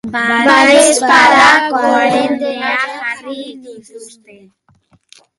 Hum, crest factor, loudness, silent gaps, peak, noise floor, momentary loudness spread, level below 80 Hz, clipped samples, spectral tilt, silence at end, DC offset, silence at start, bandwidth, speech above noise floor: none; 12 dB; -10 LUFS; none; 0 dBFS; -53 dBFS; 17 LU; -54 dBFS; under 0.1%; -2 dB/octave; 1.3 s; under 0.1%; 0.05 s; 12.5 kHz; 42 dB